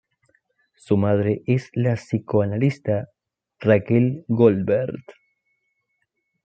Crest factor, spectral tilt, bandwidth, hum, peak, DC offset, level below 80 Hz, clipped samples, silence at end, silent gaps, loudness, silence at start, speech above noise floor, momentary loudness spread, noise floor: 20 dB; -9 dB/octave; 8.4 kHz; none; -2 dBFS; under 0.1%; -62 dBFS; under 0.1%; 1.35 s; none; -21 LUFS; 0.9 s; 54 dB; 8 LU; -74 dBFS